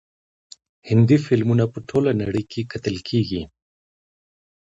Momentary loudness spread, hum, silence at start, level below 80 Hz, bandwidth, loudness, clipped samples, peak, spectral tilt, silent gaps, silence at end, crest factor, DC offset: 11 LU; none; 0.85 s; -50 dBFS; 7.8 kHz; -21 LUFS; under 0.1%; -4 dBFS; -8 dB/octave; none; 1.2 s; 18 dB; under 0.1%